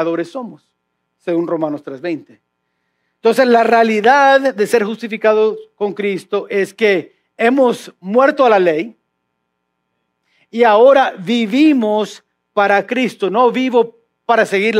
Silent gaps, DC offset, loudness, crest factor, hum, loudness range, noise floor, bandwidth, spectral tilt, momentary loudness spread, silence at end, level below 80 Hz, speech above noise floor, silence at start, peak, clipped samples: none; under 0.1%; -14 LUFS; 14 dB; none; 3 LU; -71 dBFS; 14.5 kHz; -5 dB/octave; 14 LU; 0 s; -78 dBFS; 58 dB; 0 s; 0 dBFS; under 0.1%